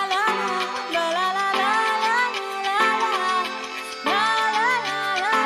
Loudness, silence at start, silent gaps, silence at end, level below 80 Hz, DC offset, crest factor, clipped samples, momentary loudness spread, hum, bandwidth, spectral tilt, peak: -22 LUFS; 0 s; none; 0 s; -70 dBFS; under 0.1%; 14 dB; under 0.1%; 6 LU; none; 15.5 kHz; -1.5 dB/octave; -8 dBFS